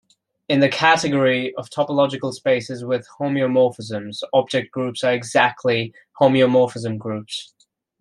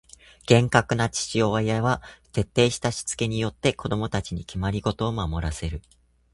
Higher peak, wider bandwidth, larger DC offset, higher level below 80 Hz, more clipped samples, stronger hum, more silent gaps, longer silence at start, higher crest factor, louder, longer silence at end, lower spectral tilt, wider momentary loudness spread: about the same, -2 dBFS vs -2 dBFS; about the same, 11.5 kHz vs 11.5 kHz; neither; second, -66 dBFS vs -40 dBFS; neither; neither; neither; about the same, 0.5 s vs 0.5 s; second, 18 dB vs 24 dB; first, -20 LUFS vs -25 LUFS; about the same, 0.55 s vs 0.55 s; about the same, -5 dB/octave vs -5 dB/octave; about the same, 12 LU vs 10 LU